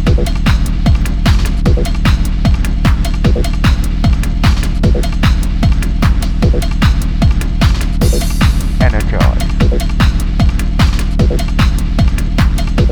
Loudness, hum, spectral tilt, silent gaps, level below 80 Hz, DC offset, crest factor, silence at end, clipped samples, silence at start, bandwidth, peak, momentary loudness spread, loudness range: -14 LUFS; none; -6 dB/octave; none; -12 dBFS; under 0.1%; 10 dB; 0 s; under 0.1%; 0 s; 18 kHz; 0 dBFS; 1 LU; 1 LU